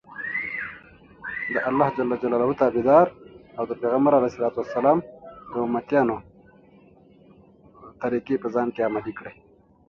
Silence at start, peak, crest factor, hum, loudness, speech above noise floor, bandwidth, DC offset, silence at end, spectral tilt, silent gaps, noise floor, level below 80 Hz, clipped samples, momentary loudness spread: 0.1 s; -4 dBFS; 22 dB; none; -23 LUFS; 31 dB; 6.6 kHz; under 0.1%; 0.55 s; -8.5 dB/octave; none; -53 dBFS; -60 dBFS; under 0.1%; 17 LU